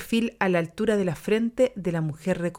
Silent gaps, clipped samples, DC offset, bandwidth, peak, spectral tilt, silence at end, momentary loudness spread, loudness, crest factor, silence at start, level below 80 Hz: none; under 0.1%; under 0.1%; 17 kHz; -8 dBFS; -6.5 dB/octave; 0 s; 4 LU; -25 LUFS; 18 dB; 0 s; -54 dBFS